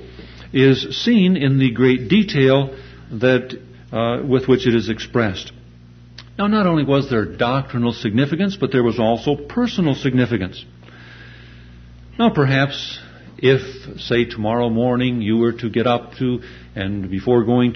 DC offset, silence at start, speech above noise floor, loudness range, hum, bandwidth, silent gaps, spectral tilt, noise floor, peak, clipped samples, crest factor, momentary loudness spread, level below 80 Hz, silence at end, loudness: under 0.1%; 0 s; 26 dB; 4 LU; 60 Hz at -40 dBFS; 6.6 kHz; none; -7.5 dB/octave; -43 dBFS; -2 dBFS; under 0.1%; 16 dB; 14 LU; -44 dBFS; 0 s; -18 LUFS